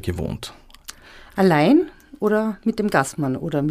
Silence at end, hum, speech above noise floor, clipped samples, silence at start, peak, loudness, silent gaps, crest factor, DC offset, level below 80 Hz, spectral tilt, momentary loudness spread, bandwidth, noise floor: 0 s; none; 23 dB; under 0.1%; 0.05 s; -2 dBFS; -20 LUFS; none; 18 dB; under 0.1%; -46 dBFS; -6.5 dB/octave; 22 LU; 15.5 kHz; -42 dBFS